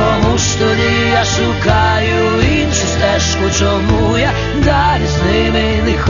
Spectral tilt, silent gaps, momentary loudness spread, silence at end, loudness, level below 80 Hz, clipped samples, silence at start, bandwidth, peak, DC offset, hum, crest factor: -4.5 dB/octave; none; 2 LU; 0 s; -13 LUFS; -22 dBFS; under 0.1%; 0 s; 7.4 kHz; 0 dBFS; 0.4%; none; 12 dB